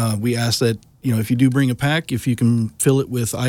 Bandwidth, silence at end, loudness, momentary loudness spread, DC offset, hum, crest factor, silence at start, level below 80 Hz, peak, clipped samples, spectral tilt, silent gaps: 17 kHz; 0 s; -19 LUFS; 5 LU; under 0.1%; none; 14 dB; 0 s; -50 dBFS; -4 dBFS; under 0.1%; -5.5 dB/octave; none